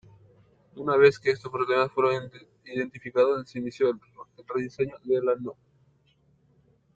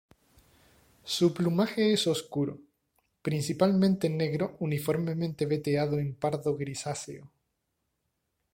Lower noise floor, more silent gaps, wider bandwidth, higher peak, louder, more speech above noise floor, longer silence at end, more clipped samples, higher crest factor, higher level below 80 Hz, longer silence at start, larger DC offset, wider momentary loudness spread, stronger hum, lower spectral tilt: second, -65 dBFS vs -80 dBFS; neither; second, 7.8 kHz vs 16.5 kHz; first, -6 dBFS vs -10 dBFS; first, -26 LUFS vs -29 LUFS; second, 39 dB vs 52 dB; first, 1.45 s vs 1.25 s; neither; about the same, 22 dB vs 20 dB; about the same, -68 dBFS vs -64 dBFS; second, 0.75 s vs 1.05 s; neither; first, 15 LU vs 11 LU; neither; about the same, -6.5 dB/octave vs -6 dB/octave